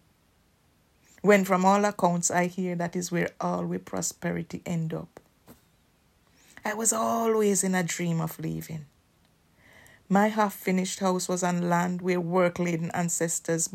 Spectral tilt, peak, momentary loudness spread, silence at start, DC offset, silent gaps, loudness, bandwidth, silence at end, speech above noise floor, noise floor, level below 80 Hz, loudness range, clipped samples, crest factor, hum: -5 dB/octave; -8 dBFS; 11 LU; 1.25 s; under 0.1%; none; -27 LUFS; 16 kHz; 0.05 s; 39 dB; -65 dBFS; -68 dBFS; 6 LU; under 0.1%; 20 dB; none